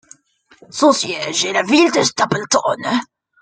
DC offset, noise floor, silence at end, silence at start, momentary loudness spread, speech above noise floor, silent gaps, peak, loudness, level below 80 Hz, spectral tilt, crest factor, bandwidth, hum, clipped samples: under 0.1%; -48 dBFS; 0.35 s; 0.75 s; 7 LU; 32 dB; none; 0 dBFS; -16 LUFS; -62 dBFS; -3 dB/octave; 18 dB; 9.6 kHz; none; under 0.1%